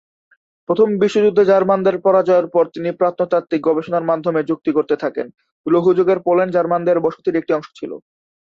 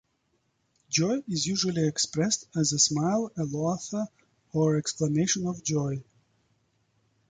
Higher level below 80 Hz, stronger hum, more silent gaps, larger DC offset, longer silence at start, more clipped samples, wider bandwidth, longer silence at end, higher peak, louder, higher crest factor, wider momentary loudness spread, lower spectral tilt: about the same, -62 dBFS vs -64 dBFS; neither; first, 5.52-5.64 s vs none; neither; second, 0.7 s vs 0.9 s; neither; second, 7.6 kHz vs 9.6 kHz; second, 0.5 s vs 1.25 s; first, -2 dBFS vs -10 dBFS; first, -17 LUFS vs -27 LUFS; second, 14 dB vs 20 dB; about the same, 9 LU vs 10 LU; first, -7.5 dB/octave vs -4 dB/octave